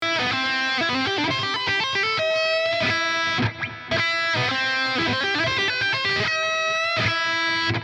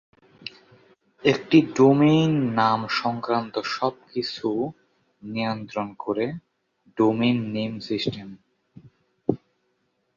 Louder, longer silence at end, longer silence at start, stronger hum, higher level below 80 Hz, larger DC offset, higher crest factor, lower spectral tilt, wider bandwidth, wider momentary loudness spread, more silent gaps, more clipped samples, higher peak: about the same, -21 LUFS vs -23 LUFS; second, 0 s vs 0.8 s; second, 0 s vs 0.45 s; neither; about the same, -58 dBFS vs -62 dBFS; neither; second, 12 dB vs 20 dB; second, -3.5 dB/octave vs -6.5 dB/octave; first, 10.5 kHz vs 7.4 kHz; second, 2 LU vs 21 LU; neither; neither; second, -10 dBFS vs -4 dBFS